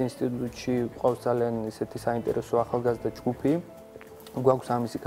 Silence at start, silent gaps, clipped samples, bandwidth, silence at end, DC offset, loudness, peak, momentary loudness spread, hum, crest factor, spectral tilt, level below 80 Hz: 0 s; none; under 0.1%; 16 kHz; 0 s; under 0.1%; -28 LUFS; -8 dBFS; 10 LU; none; 20 dB; -7 dB/octave; -56 dBFS